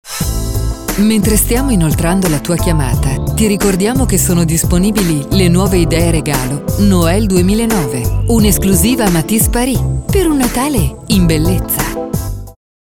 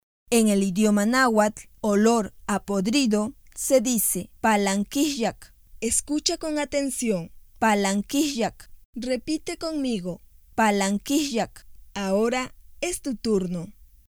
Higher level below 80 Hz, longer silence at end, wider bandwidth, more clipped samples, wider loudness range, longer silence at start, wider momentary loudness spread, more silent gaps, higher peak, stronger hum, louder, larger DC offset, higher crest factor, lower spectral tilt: first, -20 dBFS vs -52 dBFS; second, 0.3 s vs 0.5 s; about the same, 19 kHz vs 20 kHz; neither; second, 1 LU vs 4 LU; second, 0.05 s vs 0.3 s; second, 7 LU vs 11 LU; second, none vs 8.85-8.93 s; first, 0 dBFS vs -4 dBFS; neither; first, -13 LUFS vs -24 LUFS; neither; second, 12 dB vs 20 dB; about the same, -5 dB/octave vs -4 dB/octave